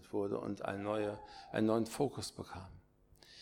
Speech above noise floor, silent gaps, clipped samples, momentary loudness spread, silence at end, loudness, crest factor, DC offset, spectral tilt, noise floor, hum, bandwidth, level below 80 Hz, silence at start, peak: 26 dB; none; under 0.1%; 16 LU; 0 s; -38 LUFS; 20 dB; under 0.1%; -5.5 dB/octave; -64 dBFS; none; 18 kHz; -66 dBFS; 0 s; -18 dBFS